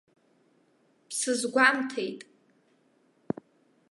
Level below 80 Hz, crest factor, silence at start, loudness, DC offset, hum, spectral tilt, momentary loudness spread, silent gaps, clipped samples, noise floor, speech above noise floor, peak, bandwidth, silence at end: -78 dBFS; 24 dB; 1.1 s; -27 LUFS; under 0.1%; none; -2.5 dB/octave; 16 LU; none; under 0.1%; -67 dBFS; 40 dB; -8 dBFS; 12 kHz; 1.7 s